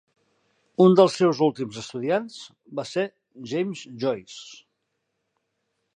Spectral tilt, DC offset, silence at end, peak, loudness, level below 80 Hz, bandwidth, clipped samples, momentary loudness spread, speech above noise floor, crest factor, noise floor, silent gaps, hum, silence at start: -6.5 dB/octave; under 0.1%; 1.4 s; -4 dBFS; -23 LUFS; -74 dBFS; 9.8 kHz; under 0.1%; 23 LU; 54 dB; 22 dB; -77 dBFS; none; none; 0.8 s